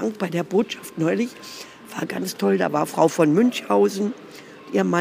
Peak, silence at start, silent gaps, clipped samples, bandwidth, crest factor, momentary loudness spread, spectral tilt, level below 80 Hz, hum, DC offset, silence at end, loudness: -4 dBFS; 0 s; none; under 0.1%; 15.5 kHz; 18 dB; 19 LU; -5.5 dB/octave; -72 dBFS; none; under 0.1%; 0 s; -22 LUFS